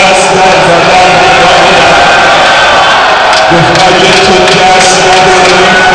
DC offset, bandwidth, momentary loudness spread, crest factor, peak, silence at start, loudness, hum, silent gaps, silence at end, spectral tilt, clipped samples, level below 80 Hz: under 0.1%; 11 kHz; 1 LU; 4 dB; 0 dBFS; 0 s; -3 LUFS; none; none; 0 s; -3 dB/octave; under 0.1%; -30 dBFS